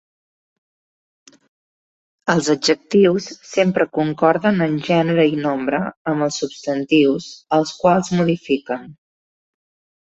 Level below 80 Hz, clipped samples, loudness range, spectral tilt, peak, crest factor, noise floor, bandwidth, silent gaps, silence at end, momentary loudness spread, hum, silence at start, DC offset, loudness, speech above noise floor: -60 dBFS; under 0.1%; 3 LU; -5.5 dB/octave; -2 dBFS; 18 dB; under -90 dBFS; 8.2 kHz; 5.97-6.05 s; 1.2 s; 9 LU; none; 2.25 s; under 0.1%; -18 LUFS; over 72 dB